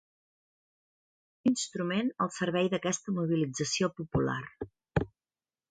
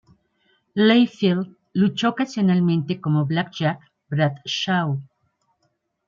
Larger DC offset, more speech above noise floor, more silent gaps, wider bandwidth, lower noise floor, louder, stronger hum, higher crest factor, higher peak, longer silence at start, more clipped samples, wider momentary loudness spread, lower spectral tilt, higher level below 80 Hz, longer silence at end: neither; first, over 59 dB vs 51 dB; neither; first, 9.6 kHz vs 7.4 kHz; first, under -90 dBFS vs -71 dBFS; second, -31 LUFS vs -21 LUFS; neither; about the same, 20 dB vs 18 dB; second, -12 dBFS vs -4 dBFS; first, 1.45 s vs 0.75 s; neither; second, 5 LU vs 10 LU; second, -5 dB/octave vs -6.5 dB/octave; first, -56 dBFS vs -66 dBFS; second, 0.65 s vs 1.05 s